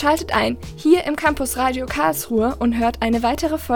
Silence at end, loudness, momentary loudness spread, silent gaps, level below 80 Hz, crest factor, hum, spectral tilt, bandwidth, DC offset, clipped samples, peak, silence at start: 0 s; -20 LUFS; 4 LU; none; -36 dBFS; 18 dB; none; -4.5 dB/octave; 19 kHz; under 0.1%; under 0.1%; -2 dBFS; 0 s